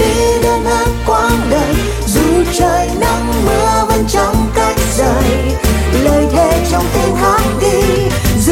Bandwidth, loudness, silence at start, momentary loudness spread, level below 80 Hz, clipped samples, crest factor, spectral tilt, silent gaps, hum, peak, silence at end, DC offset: 17 kHz; -12 LUFS; 0 s; 3 LU; -20 dBFS; under 0.1%; 10 dB; -5 dB/octave; none; none; 0 dBFS; 0 s; under 0.1%